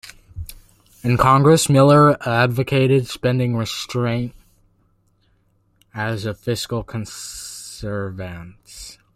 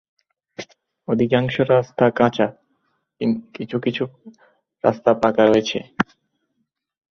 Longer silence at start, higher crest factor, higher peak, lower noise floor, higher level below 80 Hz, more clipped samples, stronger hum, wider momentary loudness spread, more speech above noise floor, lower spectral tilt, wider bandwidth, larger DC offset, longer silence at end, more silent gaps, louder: second, 0.05 s vs 0.6 s; about the same, 18 dB vs 20 dB; about the same, -2 dBFS vs -2 dBFS; second, -61 dBFS vs -74 dBFS; first, -46 dBFS vs -58 dBFS; neither; neither; first, 24 LU vs 21 LU; second, 43 dB vs 55 dB; about the same, -5.5 dB/octave vs -6.5 dB/octave; first, 15 kHz vs 7 kHz; neither; second, 0.25 s vs 1.1 s; neither; about the same, -18 LUFS vs -20 LUFS